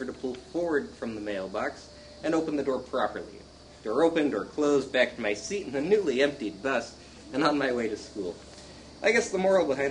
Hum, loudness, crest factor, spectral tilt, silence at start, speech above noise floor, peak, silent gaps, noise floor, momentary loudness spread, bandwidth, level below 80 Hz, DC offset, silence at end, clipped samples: none; -28 LUFS; 20 dB; -4.5 dB/octave; 0 s; 19 dB; -8 dBFS; none; -47 dBFS; 17 LU; 10.5 kHz; -58 dBFS; under 0.1%; 0 s; under 0.1%